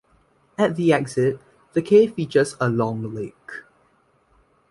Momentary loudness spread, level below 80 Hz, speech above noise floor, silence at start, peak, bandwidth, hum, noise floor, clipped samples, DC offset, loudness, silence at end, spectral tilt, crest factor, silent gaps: 21 LU; -60 dBFS; 41 dB; 0.6 s; -4 dBFS; 11.5 kHz; none; -62 dBFS; under 0.1%; under 0.1%; -21 LUFS; 1.1 s; -6.5 dB/octave; 18 dB; none